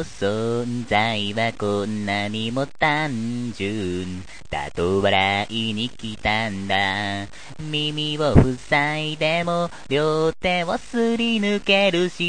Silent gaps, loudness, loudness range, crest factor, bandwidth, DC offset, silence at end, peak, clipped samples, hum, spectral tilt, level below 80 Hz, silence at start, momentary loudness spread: none; -22 LUFS; 3 LU; 22 dB; 9.8 kHz; 1%; 0 s; 0 dBFS; under 0.1%; none; -5.5 dB/octave; -40 dBFS; 0 s; 10 LU